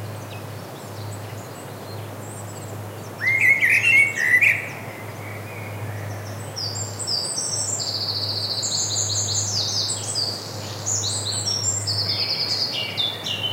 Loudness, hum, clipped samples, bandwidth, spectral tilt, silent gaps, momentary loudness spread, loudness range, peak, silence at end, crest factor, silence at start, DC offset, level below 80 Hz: -20 LUFS; none; under 0.1%; 16 kHz; -1.5 dB/octave; none; 19 LU; 8 LU; -4 dBFS; 0 s; 20 dB; 0 s; under 0.1%; -64 dBFS